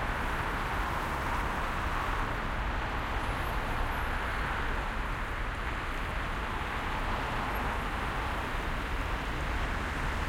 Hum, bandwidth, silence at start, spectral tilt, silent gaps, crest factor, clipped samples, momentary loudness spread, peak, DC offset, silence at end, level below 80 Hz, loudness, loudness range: none; 16.5 kHz; 0 s; -5 dB/octave; none; 14 dB; under 0.1%; 2 LU; -18 dBFS; under 0.1%; 0 s; -36 dBFS; -33 LUFS; 1 LU